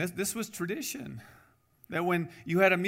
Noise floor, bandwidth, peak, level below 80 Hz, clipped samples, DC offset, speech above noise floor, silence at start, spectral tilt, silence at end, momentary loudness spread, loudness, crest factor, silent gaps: -62 dBFS; 16 kHz; -10 dBFS; -68 dBFS; under 0.1%; under 0.1%; 31 dB; 0 s; -4.5 dB/octave; 0 s; 15 LU; -31 LUFS; 20 dB; none